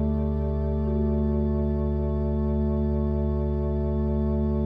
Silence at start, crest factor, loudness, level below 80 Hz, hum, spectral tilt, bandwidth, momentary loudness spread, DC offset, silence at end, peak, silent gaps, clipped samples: 0 s; 10 dB; -26 LUFS; -30 dBFS; none; -12.5 dB/octave; 3.7 kHz; 2 LU; under 0.1%; 0 s; -14 dBFS; none; under 0.1%